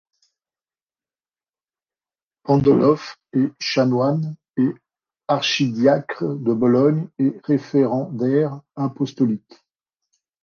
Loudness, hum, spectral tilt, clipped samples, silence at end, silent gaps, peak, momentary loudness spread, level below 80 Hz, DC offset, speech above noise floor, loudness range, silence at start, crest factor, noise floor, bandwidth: -20 LUFS; none; -6.5 dB/octave; under 0.1%; 1.05 s; 4.50-4.54 s; -4 dBFS; 10 LU; -60 dBFS; under 0.1%; over 71 dB; 3 LU; 2.45 s; 18 dB; under -90 dBFS; 6.8 kHz